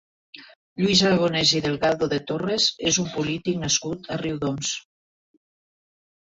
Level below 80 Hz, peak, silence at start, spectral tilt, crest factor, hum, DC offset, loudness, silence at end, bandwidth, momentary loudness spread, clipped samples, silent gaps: -56 dBFS; -6 dBFS; 0.35 s; -3.5 dB/octave; 20 dB; none; under 0.1%; -22 LUFS; 1.55 s; 8.2 kHz; 10 LU; under 0.1%; 0.56-0.76 s